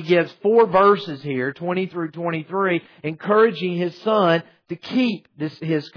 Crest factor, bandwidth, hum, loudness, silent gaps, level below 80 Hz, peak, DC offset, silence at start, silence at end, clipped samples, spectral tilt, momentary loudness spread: 16 dB; 5.4 kHz; none; -20 LUFS; none; -66 dBFS; -6 dBFS; under 0.1%; 0 s; 0.1 s; under 0.1%; -8 dB/octave; 13 LU